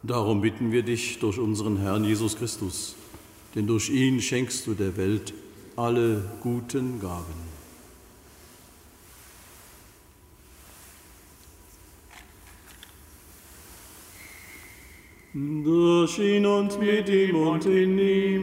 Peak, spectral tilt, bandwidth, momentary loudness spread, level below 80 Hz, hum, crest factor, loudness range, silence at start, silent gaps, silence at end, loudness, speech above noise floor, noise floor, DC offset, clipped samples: -10 dBFS; -5.5 dB/octave; 16 kHz; 24 LU; -56 dBFS; none; 16 dB; 24 LU; 0.05 s; none; 0 s; -25 LUFS; 29 dB; -54 dBFS; under 0.1%; under 0.1%